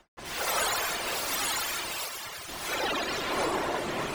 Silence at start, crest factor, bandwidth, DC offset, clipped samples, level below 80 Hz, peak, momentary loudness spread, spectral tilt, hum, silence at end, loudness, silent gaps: 0.15 s; 16 dB; over 20 kHz; under 0.1%; under 0.1%; -54 dBFS; -16 dBFS; 8 LU; -1.5 dB/octave; none; 0 s; -30 LUFS; none